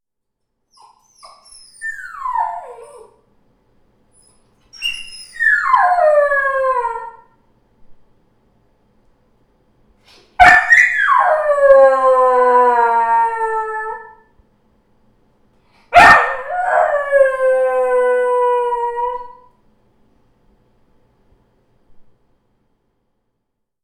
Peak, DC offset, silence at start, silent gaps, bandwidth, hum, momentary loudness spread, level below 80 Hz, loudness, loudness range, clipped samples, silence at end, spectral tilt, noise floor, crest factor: 0 dBFS; under 0.1%; 1.8 s; none; 13.5 kHz; none; 19 LU; -48 dBFS; -13 LUFS; 17 LU; under 0.1%; 1.8 s; -3 dB/octave; -77 dBFS; 16 dB